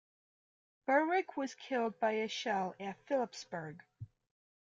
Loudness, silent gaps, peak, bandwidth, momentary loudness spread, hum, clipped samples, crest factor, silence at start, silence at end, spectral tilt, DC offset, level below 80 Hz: -36 LUFS; none; -18 dBFS; 7.6 kHz; 19 LU; none; under 0.1%; 20 dB; 0.9 s; 0.6 s; -4.5 dB/octave; under 0.1%; -82 dBFS